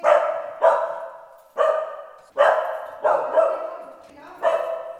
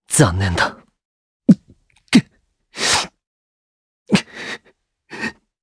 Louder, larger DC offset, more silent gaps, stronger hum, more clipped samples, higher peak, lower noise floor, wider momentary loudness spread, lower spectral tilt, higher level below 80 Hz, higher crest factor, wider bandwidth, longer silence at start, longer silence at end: second, -22 LUFS vs -18 LUFS; neither; second, none vs 1.05-1.40 s, 3.27-4.06 s; neither; neither; second, -4 dBFS vs 0 dBFS; second, -43 dBFS vs -59 dBFS; about the same, 16 LU vs 14 LU; second, -2.5 dB/octave vs -4 dB/octave; second, -72 dBFS vs -44 dBFS; about the same, 20 dB vs 20 dB; about the same, 10 kHz vs 11 kHz; about the same, 0 s vs 0.1 s; second, 0 s vs 0.3 s